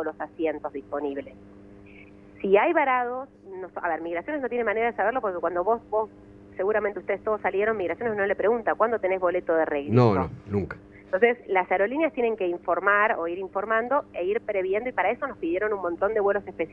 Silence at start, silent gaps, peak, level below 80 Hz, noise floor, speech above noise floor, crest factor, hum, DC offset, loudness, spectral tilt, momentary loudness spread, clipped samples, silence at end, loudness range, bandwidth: 0 s; none; -6 dBFS; -58 dBFS; -48 dBFS; 23 dB; 20 dB; none; under 0.1%; -25 LUFS; -9 dB/octave; 10 LU; under 0.1%; 0 s; 3 LU; 4.8 kHz